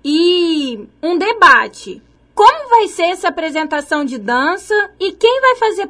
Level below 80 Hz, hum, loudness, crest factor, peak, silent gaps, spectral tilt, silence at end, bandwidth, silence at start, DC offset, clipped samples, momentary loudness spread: -54 dBFS; none; -13 LUFS; 14 dB; 0 dBFS; none; -2.5 dB/octave; 0 s; 11 kHz; 0.05 s; under 0.1%; 0.2%; 13 LU